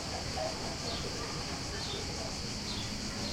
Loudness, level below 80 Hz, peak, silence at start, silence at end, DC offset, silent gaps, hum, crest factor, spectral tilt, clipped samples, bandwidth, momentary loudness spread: -36 LUFS; -48 dBFS; -24 dBFS; 0 s; 0 s; under 0.1%; none; none; 14 dB; -3 dB/octave; under 0.1%; 16.5 kHz; 1 LU